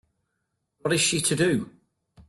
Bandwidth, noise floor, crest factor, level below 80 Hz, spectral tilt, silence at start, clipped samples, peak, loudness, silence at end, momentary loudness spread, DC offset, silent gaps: 12.5 kHz; -78 dBFS; 18 dB; -60 dBFS; -3.5 dB/octave; 0.85 s; under 0.1%; -10 dBFS; -24 LUFS; 0.05 s; 11 LU; under 0.1%; none